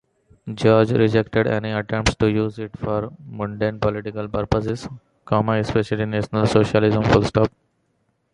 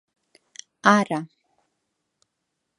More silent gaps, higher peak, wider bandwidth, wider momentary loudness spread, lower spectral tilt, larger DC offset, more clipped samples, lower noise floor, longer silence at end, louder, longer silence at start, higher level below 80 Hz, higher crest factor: neither; about the same, 0 dBFS vs 0 dBFS; about the same, 10.5 kHz vs 11.5 kHz; second, 12 LU vs 25 LU; first, -6.5 dB/octave vs -5 dB/octave; neither; neither; second, -68 dBFS vs -79 dBFS; second, 0.85 s vs 1.55 s; about the same, -21 LUFS vs -21 LUFS; second, 0.45 s vs 0.85 s; first, -40 dBFS vs -76 dBFS; second, 20 dB vs 26 dB